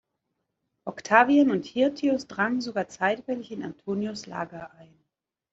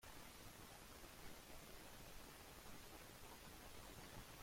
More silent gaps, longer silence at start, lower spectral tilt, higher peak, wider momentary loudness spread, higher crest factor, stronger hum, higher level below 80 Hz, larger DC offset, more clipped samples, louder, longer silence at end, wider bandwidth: neither; first, 0.85 s vs 0 s; first, -5.5 dB/octave vs -3 dB/octave; first, -2 dBFS vs -44 dBFS; first, 18 LU vs 1 LU; first, 24 dB vs 16 dB; neither; about the same, -68 dBFS vs -66 dBFS; neither; neither; first, -25 LUFS vs -59 LUFS; first, 0.85 s vs 0 s; second, 7.8 kHz vs 16.5 kHz